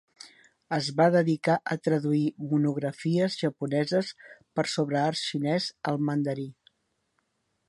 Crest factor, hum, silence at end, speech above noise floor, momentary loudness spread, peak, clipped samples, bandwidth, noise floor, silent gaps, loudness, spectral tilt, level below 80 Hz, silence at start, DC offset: 20 dB; none; 1.15 s; 49 dB; 7 LU; -8 dBFS; under 0.1%; 11.5 kHz; -76 dBFS; none; -27 LUFS; -6 dB/octave; -74 dBFS; 0.25 s; under 0.1%